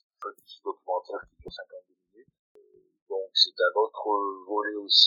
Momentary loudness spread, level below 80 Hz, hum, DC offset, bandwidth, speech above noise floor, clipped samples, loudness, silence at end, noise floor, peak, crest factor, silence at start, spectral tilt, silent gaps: 21 LU; -68 dBFS; none; under 0.1%; 12 kHz; 35 dB; under 0.1%; -27 LUFS; 0 s; -61 dBFS; -4 dBFS; 24 dB; 0.2 s; -1 dB/octave; 2.39-2.55 s, 3.02-3.06 s